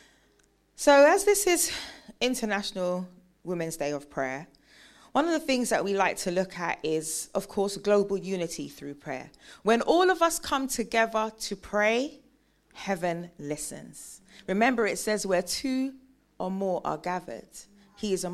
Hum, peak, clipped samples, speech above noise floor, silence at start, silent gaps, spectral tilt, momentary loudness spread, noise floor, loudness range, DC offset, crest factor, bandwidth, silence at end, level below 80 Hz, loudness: none; -8 dBFS; under 0.1%; 38 dB; 0.8 s; none; -3.5 dB/octave; 17 LU; -66 dBFS; 7 LU; under 0.1%; 20 dB; 15.5 kHz; 0 s; -60 dBFS; -27 LUFS